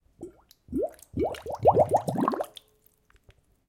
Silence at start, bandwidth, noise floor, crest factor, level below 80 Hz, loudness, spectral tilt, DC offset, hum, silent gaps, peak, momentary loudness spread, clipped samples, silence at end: 0.2 s; 17 kHz; -65 dBFS; 22 dB; -54 dBFS; -27 LUFS; -7 dB/octave; under 0.1%; none; none; -8 dBFS; 22 LU; under 0.1%; 1.2 s